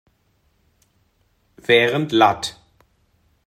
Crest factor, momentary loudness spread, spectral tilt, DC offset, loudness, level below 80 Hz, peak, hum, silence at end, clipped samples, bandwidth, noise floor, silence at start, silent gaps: 22 dB; 14 LU; -4.5 dB/octave; under 0.1%; -17 LUFS; -60 dBFS; -2 dBFS; none; 0.95 s; under 0.1%; 14.5 kHz; -64 dBFS; 1.7 s; none